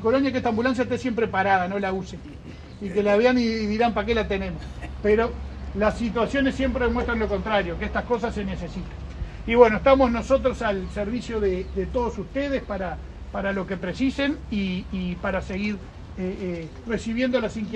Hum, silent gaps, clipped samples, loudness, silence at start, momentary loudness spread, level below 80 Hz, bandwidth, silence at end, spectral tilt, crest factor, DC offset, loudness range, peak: none; none; under 0.1%; -24 LUFS; 0 s; 15 LU; -38 dBFS; 9.4 kHz; 0 s; -6.5 dB/octave; 24 dB; under 0.1%; 6 LU; 0 dBFS